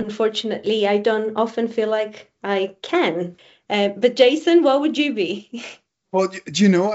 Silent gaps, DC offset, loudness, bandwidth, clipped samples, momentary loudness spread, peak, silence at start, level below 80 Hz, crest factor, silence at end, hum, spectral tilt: none; under 0.1%; -20 LUFS; 8 kHz; under 0.1%; 14 LU; -2 dBFS; 0 s; -68 dBFS; 18 dB; 0 s; none; -4 dB/octave